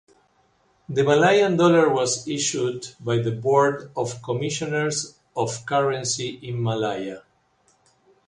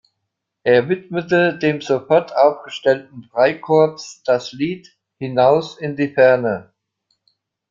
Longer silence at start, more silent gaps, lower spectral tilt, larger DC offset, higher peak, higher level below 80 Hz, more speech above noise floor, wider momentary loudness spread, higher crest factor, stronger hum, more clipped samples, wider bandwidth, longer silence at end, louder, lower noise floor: first, 0.9 s vs 0.65 s; neither; second, -4.5 dB/octave vs -6 dB/octave; neither; about the same, -4 dBFS vs -2 dBFS; about the same, -62 dBFS vs -62 dBFS; second, 42 dB vs 60 dB; about the same, 12 LU vs 11 LU; about the same, 18 dB vs 16 dB; neither; neither; first, 11 kHz vs 7.6 kHz; about the same, 1.1 s vs 1.1 s; second, -22 LUFS vs -18 LUFS; second, -63 dBFS vs -77 dBFS